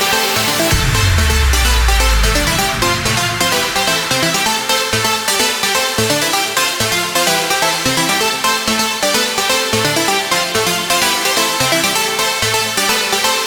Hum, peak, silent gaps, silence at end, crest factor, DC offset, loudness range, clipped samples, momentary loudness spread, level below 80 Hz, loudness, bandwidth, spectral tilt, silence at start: none; -2 dBFS; none; 0 s; 14 dB; under 0.1%; 0 LU; under 0.1%; 1 LU; -24 dBFS; -13 LUFS; 19.5 kHz; -2 dB/octave; 0 s